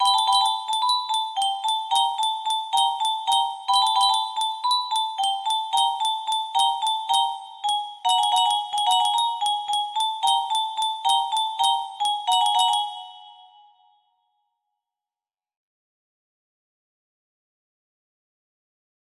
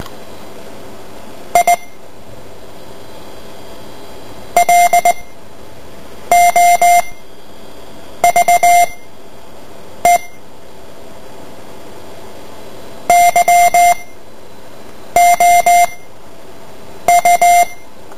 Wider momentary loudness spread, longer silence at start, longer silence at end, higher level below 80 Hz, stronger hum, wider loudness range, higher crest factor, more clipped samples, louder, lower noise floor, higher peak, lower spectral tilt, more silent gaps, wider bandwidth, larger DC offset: second, 6 LU vs 25 LU; about the same, 0 s vs 0 s; first, 5.65 s vs 0.45 s; second, -78 dBFS vs -46 dBFS; neither; second, 3 LU vs 9 LU; about the same, 18 dB vs 14 dB; neither; second, -22 LUFS vs -11 LUFS; first, under -90 dBFS vs -38 dBFS; second, -8 dBFS vs 0 dBFS; second, 3 dB/octave vs -1.5 dB/octave; neither; about the same, 15.5 kHz vs 16 kHz; second, under 0.1% vs 5%